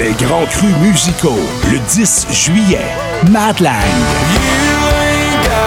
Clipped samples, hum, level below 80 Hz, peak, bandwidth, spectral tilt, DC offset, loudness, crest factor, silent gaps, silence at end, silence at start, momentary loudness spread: under 0.1%; none; -24 dBFS; 0 dBFS; 19 kHz; -4 dB/octave; under 0.1%; -11 LUFS; 10 dB; none; 0 s; 0 s; 4 LU